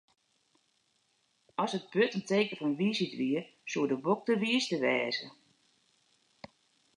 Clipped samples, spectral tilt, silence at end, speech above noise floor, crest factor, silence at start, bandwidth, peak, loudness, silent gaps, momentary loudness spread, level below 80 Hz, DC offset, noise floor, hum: under 0.1%; -5 dB/octave; 1.65 s; 43 dB; 18 dB; 1.6 s; 10.5 kHz; -14 dBFS; -31 LUFS; none; 7 LU; -84 dBFS; under 0.1%; -74 dBFS; none